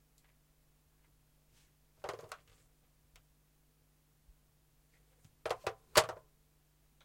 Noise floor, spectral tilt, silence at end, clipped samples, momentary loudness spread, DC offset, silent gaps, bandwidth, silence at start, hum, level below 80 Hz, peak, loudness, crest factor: -71 dBFS; -1.5 dB/octave; 0.9 s; under 0.1%; 23 LU; under 0.1%; none; 16.5 kHz; 2.05 s; none; -68 dBFS; -10 dBFS; -35 LUFS; 34 dB